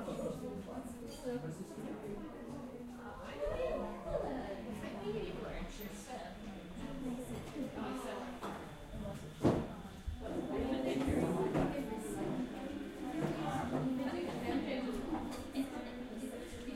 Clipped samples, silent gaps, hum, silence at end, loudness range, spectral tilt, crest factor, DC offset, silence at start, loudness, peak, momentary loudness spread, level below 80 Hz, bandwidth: under 0.1%; none; none; 0 s; 7 LU; -6.5 dB/octave; 22 dB; under 0.1%; 0 s; -41 LUFS; -18 dBFS; 12 LU; -54 dBFS; 16 kHz